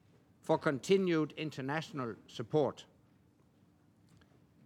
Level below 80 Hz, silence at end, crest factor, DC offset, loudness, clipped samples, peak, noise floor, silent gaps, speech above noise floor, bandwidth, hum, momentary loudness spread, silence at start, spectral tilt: -80 dBFS; 1.8 s; 20 dB; under 0.1%; -35 LUFS; under 0.1%; -16 dBFS; -67 dBFS; none; 33 dB; 13 kHz; none; 14 LU; 0.45 s; -6 dB/octave